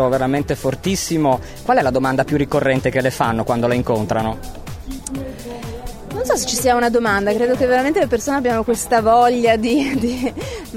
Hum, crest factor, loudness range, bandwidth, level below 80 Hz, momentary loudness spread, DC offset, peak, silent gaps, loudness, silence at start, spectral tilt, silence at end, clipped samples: none; 16 dB; 6 LU; 16.5 kHz; -38 dBFS; 15 LU; under 0.1%; -2 dBFS; none; -17 LUFS; 0 s; -5 dB/octave; 0 s; under 0.1%